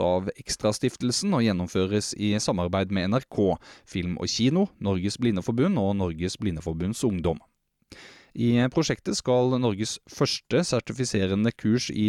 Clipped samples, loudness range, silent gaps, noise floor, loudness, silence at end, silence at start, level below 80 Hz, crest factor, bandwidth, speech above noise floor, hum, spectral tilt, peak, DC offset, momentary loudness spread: under 0.1%; 2 LU; none; -53 dBFS; -26 LUFS; 0 s; 0 s; -52 dBFS; 14 dB; 13 kHz; 28 dB; none; -5.5 dB/octave; -12 dBFS; under 0.1%; 7 LU